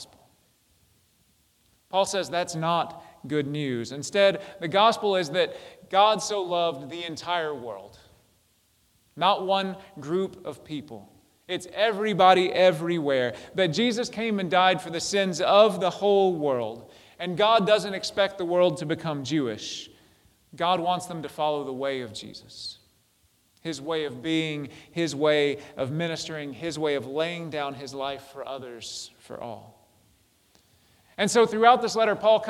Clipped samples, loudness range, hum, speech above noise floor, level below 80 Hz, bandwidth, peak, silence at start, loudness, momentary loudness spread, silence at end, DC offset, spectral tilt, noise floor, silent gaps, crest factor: under 0.1%; 9 LU; none; 41 dB; -68 dBFS; 15.5 kHz; -4 dBFS; 0 s; -25 LUFS; 17 LU; 0 s; under 0.1%; -4.5 dB/octave; -66 dBFS; none; 22 dB